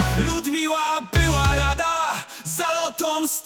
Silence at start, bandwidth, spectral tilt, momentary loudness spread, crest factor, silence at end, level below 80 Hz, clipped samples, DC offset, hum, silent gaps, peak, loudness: 0 s; 19.5 kHz; -4 dB/octave; 6 LU; 14 dB; 0 s; -30 dBFS; under 0.1%; under 0.1%; none; none; -8 dBFS; -22 LUFS